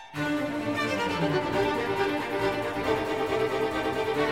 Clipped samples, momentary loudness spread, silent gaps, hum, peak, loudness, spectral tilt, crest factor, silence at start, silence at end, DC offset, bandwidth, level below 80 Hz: under 0.1%; 3 LU; none; none; -14 dBFS; -28 LUFS; -5.5 dB/octave; 14 dB; 0 s; 0 s; 0.1%; 16 kHz; -52 dBFS